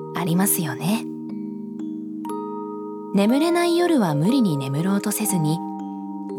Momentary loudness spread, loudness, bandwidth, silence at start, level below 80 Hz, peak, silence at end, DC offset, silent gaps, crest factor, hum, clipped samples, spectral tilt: 13 LU; -23 LUFS; 19 kHz; 0 s; -78 dBFS; -6 dBFS; 0 s; under 0.1%; none; 16 dB; none; under 0.1%; -5.5 dB/octave